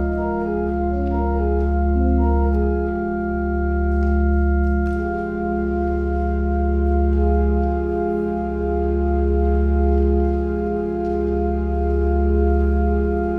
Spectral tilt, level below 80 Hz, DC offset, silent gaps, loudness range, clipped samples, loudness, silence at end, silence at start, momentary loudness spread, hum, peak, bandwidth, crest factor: -11.5 dB/octave; -22 dBFS; under 0.1%; none; 1 LU; under 0.1%; -20 LUFS; 0 s; 0 s; 4 LU; none; -6 dBFS; 2.9 kHz; 12 dB